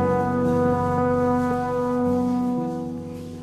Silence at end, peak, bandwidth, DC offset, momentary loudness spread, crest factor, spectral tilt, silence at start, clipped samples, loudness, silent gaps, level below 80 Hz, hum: 0 s; -10 dBFS; 13 kHz; under 0.1%; 9 LU; 12 dB; -8.5 dB/octave; 0 s; under 0.1%; -23 LUFS; none; -44 dBFS; none